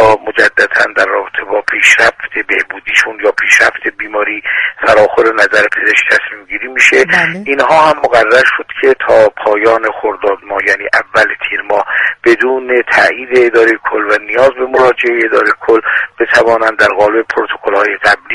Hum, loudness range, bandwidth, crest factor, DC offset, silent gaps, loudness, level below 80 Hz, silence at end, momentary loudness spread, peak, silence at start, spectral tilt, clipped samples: none; 2 LU; 12 kHz; 10 dB; under 0.1%; none; -9 LUFS; -46 dBFS; 0 s; 7 LU; 0 dBFS; 0 s; -3 dB/octave; 0.4%